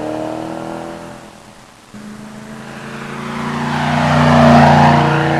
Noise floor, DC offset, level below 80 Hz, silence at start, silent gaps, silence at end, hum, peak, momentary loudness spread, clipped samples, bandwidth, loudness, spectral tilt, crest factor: -40 dBFS; under 0.1%; -42 dBFS; 0 s; none; 0 s; none; 0 dBFS; 24 LU; under 0.1%; 12 kHz; -12 LUFS; -6.5 dB/octave; 14 dB